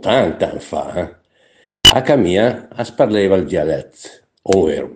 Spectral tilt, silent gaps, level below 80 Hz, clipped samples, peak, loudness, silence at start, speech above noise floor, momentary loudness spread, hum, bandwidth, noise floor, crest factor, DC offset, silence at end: -4 dB/octave; none; -40 dBFS; 0.2%; 0 dBFS; -15 LUFS; 0.05 s; 39 dB; 16 LU; none; 10 kHz; -55 dBFS; 16 dB; under 0.1%; 0 s